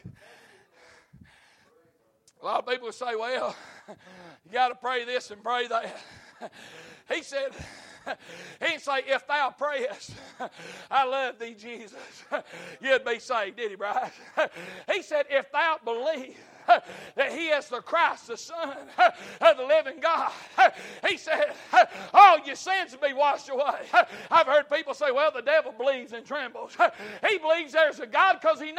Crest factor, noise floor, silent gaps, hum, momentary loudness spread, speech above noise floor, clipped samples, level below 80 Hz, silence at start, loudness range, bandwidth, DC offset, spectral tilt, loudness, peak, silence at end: 24 dB; -65 dBFS; none; none; 18 LU; 39 dB; under 0.1%; -70 dBFS; 0.05 s; 12 LU; 13 kHz; under 0.1%; -2.5 dB/octave; -25 LUFS; -2 dBFS; 0 s